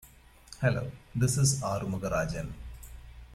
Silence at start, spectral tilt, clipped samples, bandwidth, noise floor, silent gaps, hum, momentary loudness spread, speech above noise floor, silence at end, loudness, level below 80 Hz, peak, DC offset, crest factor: 0.05 s; -5 dB/octave; under 0.1%; 14.5 kHz; -53 dBFS; none; none; 23 LU; 24 dB; 0 s; -30 LUFS; -48 dBFS; -12 dBFS; under 0.1%; 18 dB